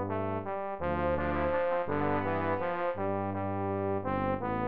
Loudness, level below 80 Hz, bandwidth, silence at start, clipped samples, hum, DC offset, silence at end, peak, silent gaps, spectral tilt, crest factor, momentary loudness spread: -32 LUFS; -50 dBFS; 5 kHz; 0 s; under 0.1%; none; 0.4%; 0 s; -18 dBFS; none; -6.5 dB/octave; 14 dB; 4 LU